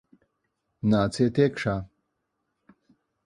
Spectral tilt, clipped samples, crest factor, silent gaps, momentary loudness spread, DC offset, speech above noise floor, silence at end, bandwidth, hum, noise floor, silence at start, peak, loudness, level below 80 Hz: -7 dB/octave; under 0.1%; 20 dB; none; 10 LU; under 0.1%; 55 dB; 1.4 s; 11.5 kHz; none; -79 dBFS; 0.85 s; -8 dBFS; -25 LUFS; -54 dBFS